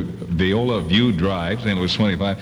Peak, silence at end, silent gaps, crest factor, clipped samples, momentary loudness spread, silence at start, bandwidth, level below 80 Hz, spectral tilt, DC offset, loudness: -6 dBFS; 0 s; none; 14 dB; under 0.1%; 4 LU; 0 s; 10.5 kHz; -40 dBFS; -6.5 dB/octave; under 0.1%; -20 LUFS